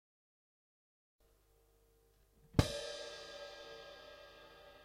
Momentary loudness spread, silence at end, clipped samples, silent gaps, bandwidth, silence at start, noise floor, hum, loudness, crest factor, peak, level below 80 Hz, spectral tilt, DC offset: 21 LU; 0 s; under 0.1%; none; 16 kHz; 2.55 s; -71 dBFS; none; -41 LUFS; 34 dB; -12 dBFS; -54 dBFS; -5 dB/octave; under 0.1%